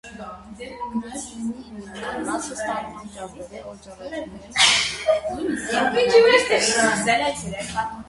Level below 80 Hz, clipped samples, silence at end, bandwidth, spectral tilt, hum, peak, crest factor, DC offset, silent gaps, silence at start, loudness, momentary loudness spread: -50 dBFS; under 0.1%; 0.05 s; 11.5 kHz; -2 dB/octave; none; -2 dBFS; 20 dB; under 0.1%; none; 0.05 s; -20 LUFS; 22 LU